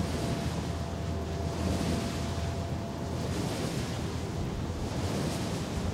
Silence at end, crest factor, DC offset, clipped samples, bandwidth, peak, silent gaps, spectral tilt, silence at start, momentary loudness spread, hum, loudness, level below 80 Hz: 0 s; 16 dB; under 0.1%; under 0.1%; 16 kHz; -16 dBFS; none; -5.5 dB/octave; 0 s; 3 LU; none; -33 LUFS; -44 dBFS